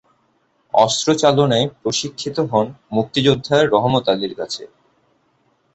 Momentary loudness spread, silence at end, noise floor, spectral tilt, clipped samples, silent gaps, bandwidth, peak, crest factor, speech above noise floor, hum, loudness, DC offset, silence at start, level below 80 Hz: 9 LU; 1.1 s; -63 dBFS; -4.5 dB/octave; under 0.1%; none; 8.2 kHz; -2 dBFS; 18 dB; 45 dB; none; -18 LUFS; under 0.1%; 0.75 s; -54 dBFS